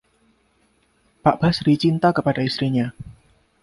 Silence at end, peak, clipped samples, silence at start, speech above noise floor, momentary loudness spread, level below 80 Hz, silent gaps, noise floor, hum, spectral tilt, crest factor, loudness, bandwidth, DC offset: 0.5 s; -2 dBFS; under 0.1%; 1.25 s; 43 dB; 11 LU; -50 dBFS; none; -63 dBFS; none; -7.5 dB/octave; 20 dB; -20 LUFS; 11.5 kHz; under 0.1%